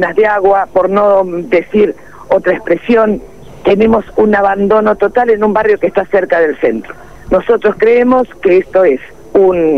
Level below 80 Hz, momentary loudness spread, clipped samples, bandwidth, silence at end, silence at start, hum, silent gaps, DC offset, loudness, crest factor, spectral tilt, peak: -40 dBFS; 6 LU; under 0.1%; 6.4 kHz; 0 s; 0 s; none; none; 1%; -11 LUFS; 10 dB; -7.5 dB/octave; 0 dBFS